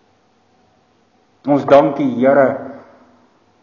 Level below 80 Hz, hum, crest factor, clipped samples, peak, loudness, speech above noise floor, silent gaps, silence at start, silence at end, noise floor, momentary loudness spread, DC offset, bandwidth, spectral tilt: -60 dBFS; none; 18 dB; under 0.1%; 0 dBFS; -14 LUFS; 44 dB; none; 1.45 s; 0.8 s; -57 dBFS; 16 LU; under 0.1%; 6.8 kHz; -8 dB/octave